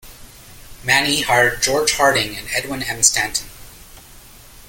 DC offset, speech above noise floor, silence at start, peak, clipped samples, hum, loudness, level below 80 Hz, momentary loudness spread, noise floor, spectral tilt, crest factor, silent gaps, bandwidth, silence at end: under 0.1%; 24 dB; 0.05 s; 0 dBFS; under 0.1%; none; -16 LUFS; -42 dBFS; 10 LU; -42 dBFS; -1.5 dB/octave; 20 dB; none; 17 kHz; 0.05 s